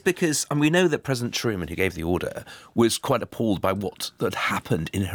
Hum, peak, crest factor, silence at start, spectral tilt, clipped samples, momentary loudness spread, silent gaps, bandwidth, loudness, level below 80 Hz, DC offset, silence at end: none; -8 dBFS; 16 dB; 0.05 s; -4.5 dB/octave; under 0.1%; 7 LU; none; over 20 kHz; -24 LUFS; -54 dBFS; under 0.1%; 0 s